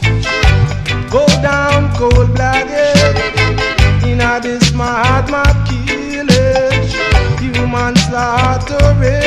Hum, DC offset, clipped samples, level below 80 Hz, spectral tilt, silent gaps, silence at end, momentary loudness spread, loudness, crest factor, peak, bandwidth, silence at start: none; under 0.1%; under 0.1%; -20 dBFS; -5.5 dB/octave; none; 0 s; 5 LU; -12 LUFS; 12 dB; 0 dBFS; 12.5 kHz; 0 s